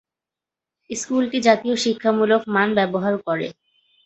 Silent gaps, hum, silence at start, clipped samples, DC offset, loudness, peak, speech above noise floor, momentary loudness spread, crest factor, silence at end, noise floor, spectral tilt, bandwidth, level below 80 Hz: none; none; 0.9 s; under 0.1%; under 0.1%; -20 LUFS; -2 dBFS; 68 dB; 9 LU; 20 dB; 0.55 s; -88 dBFS; -4.5 dB/octave; 8.2 kHz; -64 dBFS